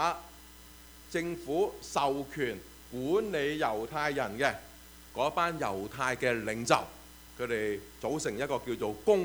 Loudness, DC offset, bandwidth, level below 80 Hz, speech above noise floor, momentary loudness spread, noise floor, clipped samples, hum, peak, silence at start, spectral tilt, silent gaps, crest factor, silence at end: -32 LUFS; under 0.1%; over 20 kHz; -58 dBFS; 21 dB; 21 LU; -52 dBFS; under 0.1%; none; -8 dBFS; 0 s; -4.5 dB/octave; none; 24 dB; 0 s